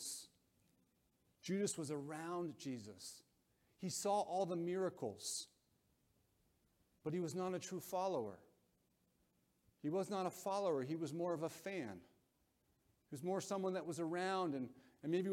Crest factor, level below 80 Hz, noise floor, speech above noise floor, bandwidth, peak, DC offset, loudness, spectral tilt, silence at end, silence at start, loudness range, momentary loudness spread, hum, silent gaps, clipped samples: 18 dB; -86 dBFS; -81 dBFS; 38 dB; 16.5 kHz; -28 dBFS; under 0.1%; -43 LUFS; -5 dB/octave; 0 s; 0 s; 3 LU; 12 LU; none; none; under 0.1%